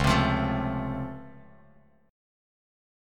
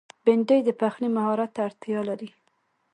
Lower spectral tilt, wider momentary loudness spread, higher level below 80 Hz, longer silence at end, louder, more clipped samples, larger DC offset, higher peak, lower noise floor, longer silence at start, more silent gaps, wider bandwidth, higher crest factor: second, -6 dB/octave vs -7.5 dB/octave; first, 20 LU vs 11 LU; first, -40 dBFS vs -76 dBFS; first, 0.95 s vs 0.65 s; second, -28 LUFS vs -25 LUFS; neither; neither; about the same, -8 dBFS vs -6 dBFS; second, -59 dBFS vs -71 dBFS; second, 0 s vs 0.25 s; neither; first, 16 kHz vs 10 kHz; about the same, 22 dB vs 18 dB